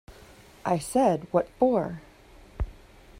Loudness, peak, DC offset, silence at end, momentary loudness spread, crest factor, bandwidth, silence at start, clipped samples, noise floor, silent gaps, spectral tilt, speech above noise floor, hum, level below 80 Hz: -27 LUFS; -8 dBFS; under 0.1%; 0 s; 14 LU; 20 dB; 16 kHz; 0.1 s; under 0.1%; -52 dBFS; none; -6.5 dB/octave; 27 dB; none; -44 dBFS